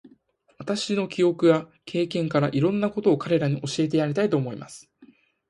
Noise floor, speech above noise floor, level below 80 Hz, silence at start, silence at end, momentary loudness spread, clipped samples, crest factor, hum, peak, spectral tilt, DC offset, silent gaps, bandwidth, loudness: -60 dBFS; 37 dB; -64 dBFS; 0.6 s; 0.45 s; 11 LU; under 0.1%; 18 dB; none; -6 dBFS; -6.5 dB/octave; under 0.1%; none; 11.5 kHz; -24 LUFS